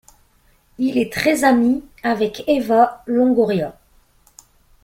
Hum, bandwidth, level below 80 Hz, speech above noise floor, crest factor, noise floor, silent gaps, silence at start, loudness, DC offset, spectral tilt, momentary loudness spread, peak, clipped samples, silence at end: none; 16 kHz; -52 dBFS; 40 dB; 16 dB; -57 dBFS; none; 0.8 s; -18 LUFS; under 0.1%; -5 dB/octave; 8 LU; -2 dBFS; under 0.1%; 1.15 s